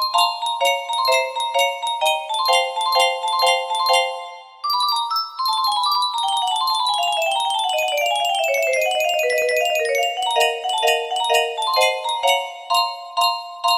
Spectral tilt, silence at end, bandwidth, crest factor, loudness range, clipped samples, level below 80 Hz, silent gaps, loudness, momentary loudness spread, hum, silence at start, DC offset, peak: 2.5 dB/octave; 0 s; 16 kHz; 16 dB; 1 LU; under 0.1%; -72 dBFS; none; -19 LUFS; 3 LU; none; 0 s; under 0.1%; -4 dBFS